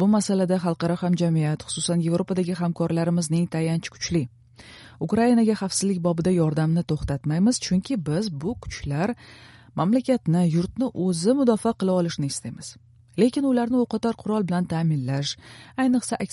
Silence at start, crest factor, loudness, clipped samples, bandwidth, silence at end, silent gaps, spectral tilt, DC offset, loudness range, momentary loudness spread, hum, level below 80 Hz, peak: 0 s; 16 dB; -24 LUFS; under 0.1%; 11.5 kHz; 0 s; none; -6 dB/octave; under 0.1%; 2 LU; 9 LU; none; -50 dBFS; -8 dBFS